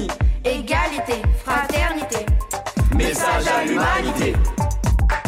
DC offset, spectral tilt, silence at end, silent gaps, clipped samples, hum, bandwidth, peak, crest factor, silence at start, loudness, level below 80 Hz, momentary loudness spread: under 0.1%; -5 dB/octave; 0 s; none; under 0.1%; none; 16 kHz; -10 dBFS; 10 dB; 0 s; -20 LUFS; -22 dBFS; 4 LU